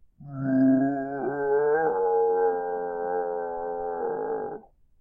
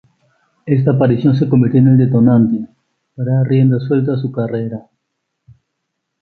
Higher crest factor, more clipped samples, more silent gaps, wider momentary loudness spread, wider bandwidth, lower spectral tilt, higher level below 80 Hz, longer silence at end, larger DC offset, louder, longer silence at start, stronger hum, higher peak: about the same, 14 dB vs 14 dB; neither; neither; second, 10 LU vs 13 LU; second, 2 kHz vs 4.5 kHz; about the same, -12 dB/octave vs -12 dB/octave; second, -62 dBFS vs -50 dBFS; second, 0.4 s vs 1.4 s; neither; second, -26 LUFS vs -14 LUFS; second, 0.2 s vs 0.65 s; neither; second, -12 dBFS vs 0 dBFS